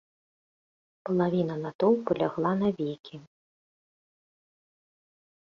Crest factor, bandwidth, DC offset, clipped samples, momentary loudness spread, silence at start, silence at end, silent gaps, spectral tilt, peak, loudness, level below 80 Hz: 20 dB; 6.8 kHz; under 0.1%; under 0.1%; 15 LU; 1.05 s; 2.25 s; 1.75-1.79 s, 3.00-3.04 s; -9 dB/octave; -12 dBFS; -28 LUFS; -68 dBFS